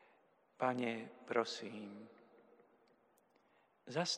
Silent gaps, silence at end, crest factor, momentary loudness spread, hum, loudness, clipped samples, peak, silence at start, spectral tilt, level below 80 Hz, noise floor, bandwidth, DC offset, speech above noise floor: none; 0 s; 24 dB; 19 LU; none; -41 LUFS; under 0.1%; -20 dBFS; 0.6 s; -4 dB/octave; under -90 dBFS; -74 dBFS; 11 kHz; under 0.1%; 33 dB